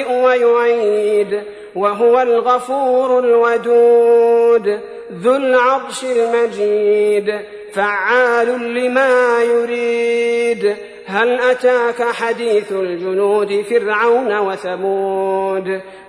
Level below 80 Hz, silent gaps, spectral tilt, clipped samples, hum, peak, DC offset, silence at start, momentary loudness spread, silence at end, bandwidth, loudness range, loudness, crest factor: -62 dBFS; none; -4.5 dB/octave; under 0.1%; none; -4 dBFS; under 0.1%; 0 s; 8 LU; 0.05 s; 11 kHz; 4 LU; -15 LUFS; 12 dB